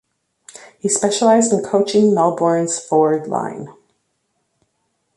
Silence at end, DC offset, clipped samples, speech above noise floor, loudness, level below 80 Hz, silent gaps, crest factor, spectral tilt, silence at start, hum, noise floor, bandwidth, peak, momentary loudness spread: 1.45 s; under 0.1%; under 0.1%; 53 dB; -16 LUFS; -64 dBFS; none; 16 dB; -4.5 dB/octave; 0.6 s; none; -69 dBFS; 11.5 kHz; -2 dBFS; 12 LU